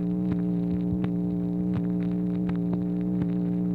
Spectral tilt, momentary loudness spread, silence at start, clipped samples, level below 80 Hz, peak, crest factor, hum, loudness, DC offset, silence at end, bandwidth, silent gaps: -11.5 dB/octave; 1 LU; 0 s; under 0.1%; -48 dBFS; -14 dBFS; 12 dB; none; -27 LUFS; 0.1%; 0 s; 4.1 kHz; none